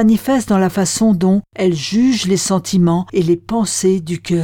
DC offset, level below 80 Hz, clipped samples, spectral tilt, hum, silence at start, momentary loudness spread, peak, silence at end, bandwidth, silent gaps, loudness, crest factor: under 0.1%; -48 dBFS; under 0.1%; -5.5 dB/octave; none; 0 s; 4 LU; -4 dBFS; 0 s; 17.5 kHz; none; -15 LUFS; 12 dB